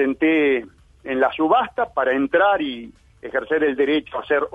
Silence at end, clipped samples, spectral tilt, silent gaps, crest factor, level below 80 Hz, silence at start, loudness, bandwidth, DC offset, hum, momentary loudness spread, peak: 0.05 s; under 0.1%; -6.5 dB/octave; none; 16 dB; -54 dBFS; 0 s; -20 LUFS; 4.9 kHz; under 0.1%; none; 10 LU; -6 dBFS